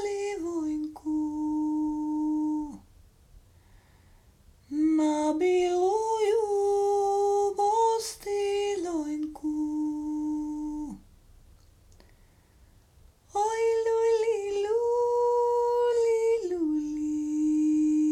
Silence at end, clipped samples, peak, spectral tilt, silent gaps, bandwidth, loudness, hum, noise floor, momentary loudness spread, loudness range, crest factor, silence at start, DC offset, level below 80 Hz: 0 s; under 0.1%; -16 dBFS; -4.5 dB/octave; none; 13.5 kHz; -27 LUFS; none; -59 dBFS; 8 LU; 9 LU; 12 dB; 0 s; under 0.1%; -58 dBFS